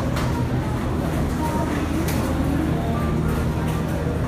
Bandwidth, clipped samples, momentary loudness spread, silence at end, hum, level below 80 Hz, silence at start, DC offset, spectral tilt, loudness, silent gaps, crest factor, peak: 15.5 kHz; under 0.1%; 2 LU; 0 s; none; -30 dBFS; 0 s; under 0.1%; -7 dB/octave; -23 LUFS; none; 12 dB; -10 dBFS